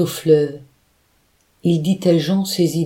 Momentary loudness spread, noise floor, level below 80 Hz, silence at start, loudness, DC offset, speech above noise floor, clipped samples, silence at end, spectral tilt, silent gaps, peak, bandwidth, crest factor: 9 LU; -60 dBFS; -60 dBFS; 0 s; -18 LUFS; under 0.1%; 44 dB; under 0.1%; 0 s; -6.5 dB/octave; none; -2 dBFS; 17.5 kHz; 16 dB